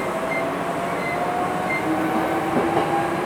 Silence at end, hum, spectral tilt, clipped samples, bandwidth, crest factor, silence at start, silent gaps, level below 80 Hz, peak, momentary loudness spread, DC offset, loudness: 0 s; none; -5.5 dB/octave; under 0.1%; 18.5 kHz; 14 dB; 0 s; none; -52 dBFS; -8 dBFS; 4 LU; under 0.1%; -23 LUFS